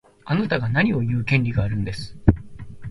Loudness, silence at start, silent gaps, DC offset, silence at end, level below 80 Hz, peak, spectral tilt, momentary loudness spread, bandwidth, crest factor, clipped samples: -22 LUFS; 0.25 s; none; under 0.1%; 0 s; -36 dBFS; 0 dBFS; -8 dB/octave; 10 LU; 11.5 kHz; 22 dB; under 0.1%